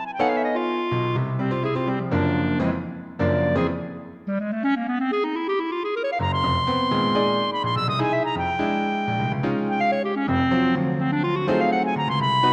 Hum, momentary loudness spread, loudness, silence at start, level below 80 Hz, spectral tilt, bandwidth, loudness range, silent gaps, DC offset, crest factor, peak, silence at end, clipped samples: none; 5 LU; -23 LUFS; 0 s; -50 dBFS; -7.5 dB/octave; 8.8 kHz; 2 LU; none; under 0.1%; 14 dB; -8 dBFS; 0 s; under 0.1%